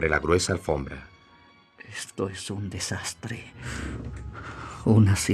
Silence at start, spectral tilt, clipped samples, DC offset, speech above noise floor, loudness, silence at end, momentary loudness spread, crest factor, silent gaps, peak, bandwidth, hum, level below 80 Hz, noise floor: 0 s; -5 dB/octave; under 0.1%; under 0.1%; 30 dB; -27 LUFS; 0 s; 18 LU; 20 dB; none; -6 dBFS; 13.5 kHz; none; -46 dBFS; -56 dBFS